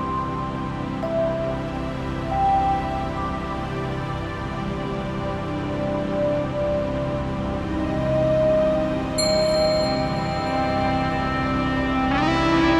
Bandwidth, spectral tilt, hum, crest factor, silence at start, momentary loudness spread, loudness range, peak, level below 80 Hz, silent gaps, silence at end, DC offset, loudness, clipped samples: 12 kHz; -6 dB/octave; none; 14 dB; 0 s; 8 LU; 5 LU; -8 dBFS; -36 dBFS; none; 0 s; under 0.1%; -23 LUFS; under 0.1%